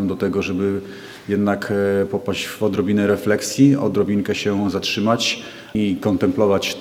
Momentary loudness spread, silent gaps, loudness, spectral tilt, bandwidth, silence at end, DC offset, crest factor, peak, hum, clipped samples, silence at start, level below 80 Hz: 8 LU; none; -19 LUFS; -5.5 dB/octave; 16 kHz; 0 s; under 0.1%; 16 dB; -2 dBFS; none; under 0.1%; 0 s; -54 dBFS